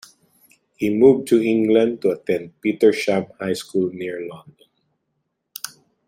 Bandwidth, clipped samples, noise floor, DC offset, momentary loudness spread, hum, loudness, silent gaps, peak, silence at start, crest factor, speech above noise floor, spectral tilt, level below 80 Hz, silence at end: 16.5 kHz; under 0.1%; -74 dBFS; under 0.1%; 18 LU; none; -19 LUFS; none; -2 dBFS; 0.8 s; 18 dB; 56 dB; -6 dB/octave; -64 dBFS; 0.4 s